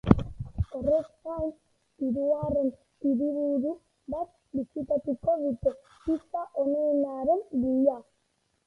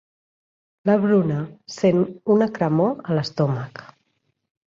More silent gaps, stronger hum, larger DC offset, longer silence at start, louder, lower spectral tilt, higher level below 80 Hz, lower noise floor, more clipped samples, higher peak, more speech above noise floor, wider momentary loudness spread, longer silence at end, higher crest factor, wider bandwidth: neither; neither; neither; second, 0.05 s vs 0.85 s; second, -29 LUFS vs -21 LUFS; first, -10.5 dB/octave vs -8 dB/octave; first, -46 dBFS vs -62 dBFS; about the same, -74 dBFS vs -71 dBFS; neither; first, -2 dBFS vs -6 dBFS; second, 46 dB vs 51 dB; about the same, 10 LU vs 11 LU; second, 0.65 s vs 0.85 s; first, 26 dB vs 16 dB; second, 6 kHz vs 7.6 kHz